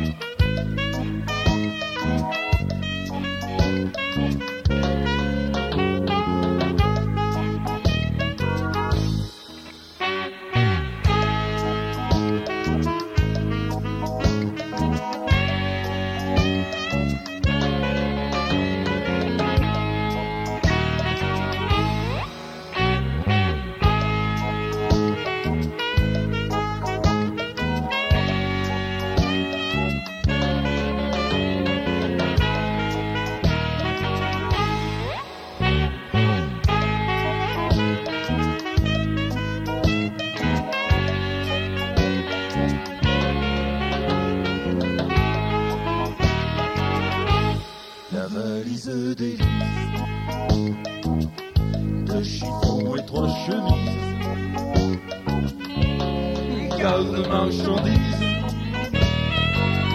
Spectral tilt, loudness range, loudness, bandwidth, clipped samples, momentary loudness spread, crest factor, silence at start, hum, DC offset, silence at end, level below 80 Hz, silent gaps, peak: -6.5 dB/octave; 2 LU; -23 LUFS; 15 kHz; under 0.1%; 5 LU; 18 dB; 0 s; none; under 0.1%; 0 s; -32 dBFS; none; -4 dBFS